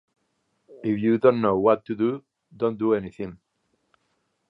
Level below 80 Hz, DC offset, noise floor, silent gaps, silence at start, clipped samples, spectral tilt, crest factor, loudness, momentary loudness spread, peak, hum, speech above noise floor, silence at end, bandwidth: -62 dBFS; under 0.1%; -73 dBFS; none; 0.7 s; under 0.1%; -9.5 dB/octave; 22 dB; -23 LUFS; 16 LU; -4 dBFS; none; 50 dB; 1.15 s; 5.2 kHz